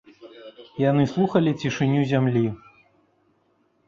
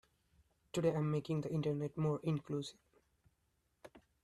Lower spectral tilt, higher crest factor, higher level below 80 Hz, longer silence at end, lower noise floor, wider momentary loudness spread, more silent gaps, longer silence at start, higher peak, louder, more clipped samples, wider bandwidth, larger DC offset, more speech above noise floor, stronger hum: about the same, -7.5 dB/octave vs -7.5 dB/octave; about the same, 18 dB vs 18 dB; first, -58 dBFS vs -72 dBFS; first, 1.3 s vs 0.25 s; second, -66 dBFS vs -80 dBFS; first, 22 LU vs 8 LU; neither; second, 0.2 s vs 0.75 s; first, -6 dBFS vs -22 dBFS; first, -22 LUFS vs -38 LUFS; neither; second, 7.4 kHz vs 12 kHz; neither; about the same, 45 dB vs 43 dB; neither